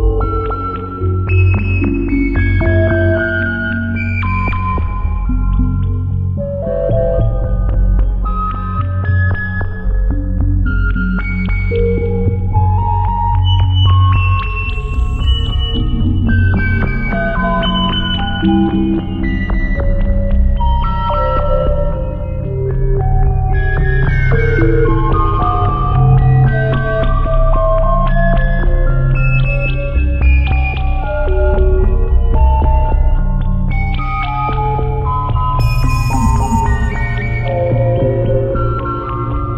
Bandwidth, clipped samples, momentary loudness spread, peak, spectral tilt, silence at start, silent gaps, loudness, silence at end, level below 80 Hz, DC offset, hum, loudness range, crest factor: 8.4 kHz; under 0.1%; 6 LU; 0 dBFS; -7.5 dB/octave; 0 s; none; -15 LUFS; 0 s; -16 dBFS; under 0.1%; none; 3 LU; 12 dB